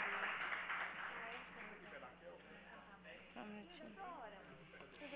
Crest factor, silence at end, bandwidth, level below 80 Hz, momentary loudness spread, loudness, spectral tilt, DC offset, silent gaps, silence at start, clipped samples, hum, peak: 22 dB; 0 s; 4 kHz; -78 dBFS; 16 LU; -49 LUFS; -1 dB/octave; under 0.1%; none; 0 s; under 0.1%; none; -28 dBFS